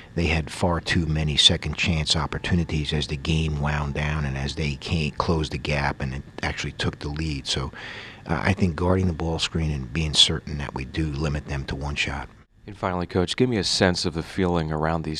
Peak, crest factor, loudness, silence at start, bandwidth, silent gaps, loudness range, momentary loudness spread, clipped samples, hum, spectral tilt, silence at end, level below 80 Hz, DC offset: -2 dBFS; 24 dB; -24 LUFS; 0 s; 11.5 kHz; none; 5 LU; 11 LU; under 0.1%; none; -4.5 dB/octave; 0 s; -36 dBFS; under 0.1%